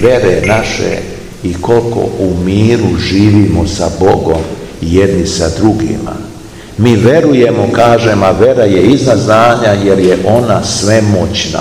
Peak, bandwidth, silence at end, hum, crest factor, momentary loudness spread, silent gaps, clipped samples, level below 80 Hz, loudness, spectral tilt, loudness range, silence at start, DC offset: 0 dBFS; 15 kHz; 0 s; none; 8 dB; 11 LU; none; 3%; -30 dBFS; -9 LUFS; -6 dB/octave; 4 LU; 0 s; 0.5%